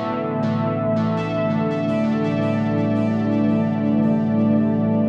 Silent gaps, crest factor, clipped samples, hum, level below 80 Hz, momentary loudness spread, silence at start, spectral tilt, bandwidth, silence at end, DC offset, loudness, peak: none; 12 dB; under 0.1%; none; -54 dBFS; 3 LU; 0 s; -9.5 dB/octave; 6.6 kHz; 0 s; under 0.1%; -20 LUFS; -8 dBFS